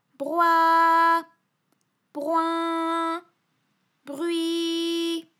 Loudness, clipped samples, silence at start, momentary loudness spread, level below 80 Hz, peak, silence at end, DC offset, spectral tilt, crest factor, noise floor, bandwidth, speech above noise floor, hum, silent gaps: -23 LUFS; under 0.1%; 0.2 s; 14 LU; under -90 dBFS; -8 dBFS; 0.2 s; under 0.1%; -2 dB/octave; 16 dB; -72 dBFS; 15 kHz; 49 dB; none; none